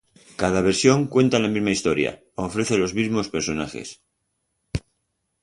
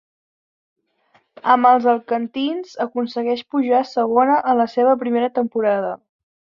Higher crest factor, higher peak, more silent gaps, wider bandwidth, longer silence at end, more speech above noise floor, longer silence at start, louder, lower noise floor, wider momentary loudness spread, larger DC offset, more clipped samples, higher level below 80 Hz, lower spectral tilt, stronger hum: about the same, 20 dB vs 18 dB; about the same, -2 dBFS vs -2 dBFS; neither; first, 11.5 kHz vs 7.2 kHz; about the same, 0.65 s vs 0.6 s; first, 53 dB vs 43 dB; second, 0.4 s vs 1.45 s; second, -22 LUFS vs -18 LUFS; first, -75 dBFS vs -60 dBFS; first, 15 LU vs 10 LU; neither; neither; first, -46 dBFS vs -70 dBFS; about the same, -5 dB/octave vs -6 dB/octave; neither